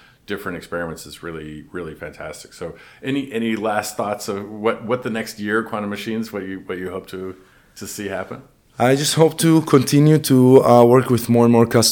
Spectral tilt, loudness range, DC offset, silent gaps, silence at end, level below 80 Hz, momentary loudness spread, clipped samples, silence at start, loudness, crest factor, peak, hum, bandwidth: -5.5 dB/octave; 14 LU; under 0.1%; none; 0 s; -54 dBFS; 20 LU; under 0.1%; 0.3 s; -17 LUFS; 18 dB; 0 dBFS; none; 19 kHz